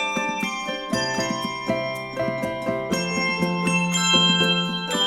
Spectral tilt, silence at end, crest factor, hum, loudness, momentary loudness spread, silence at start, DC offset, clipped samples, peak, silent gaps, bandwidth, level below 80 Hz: -3.5 dB/octave; 0 s; 18 dB; none; -22 LUFS; 10 LU; 0 s; under 0.1%; under 0.1%; -4 dBFS; none; 15.5 kHz; -54 dBFS